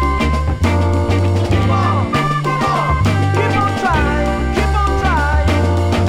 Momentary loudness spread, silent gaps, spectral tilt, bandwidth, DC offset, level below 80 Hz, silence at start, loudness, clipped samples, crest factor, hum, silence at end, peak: 2 LU; none; -6.5 dB/octave; 12 kHz; under 0.1%; -22 dBFS; 0 s; -15 LUFS; under 0.1%; 14 dB; none; 0 s; 0 dBFS